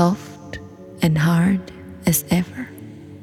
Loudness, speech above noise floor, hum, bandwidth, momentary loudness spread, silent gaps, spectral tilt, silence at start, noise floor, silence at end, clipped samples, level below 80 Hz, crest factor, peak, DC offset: -20 LUFS; 19 dB; none; 16.5 kHz; 21 LU; none; -5.5 dB/octave; 0 s; -38 dBFS; 0 s; under 0.1%; -48 dBFS; 20 dB; -2 dBFS; under 0.1%